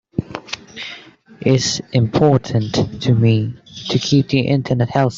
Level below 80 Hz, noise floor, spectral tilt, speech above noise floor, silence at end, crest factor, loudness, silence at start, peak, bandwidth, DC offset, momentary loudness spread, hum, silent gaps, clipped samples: -48 dBFS; -40 dBFS; -6 dB/octave; 24 dB; 0 s; 16 dB; -17 LUFS; 0.15 s; 0 dBFS; 7.6 kHz; under 0.1%; 15 LU; none; none; under 0.1%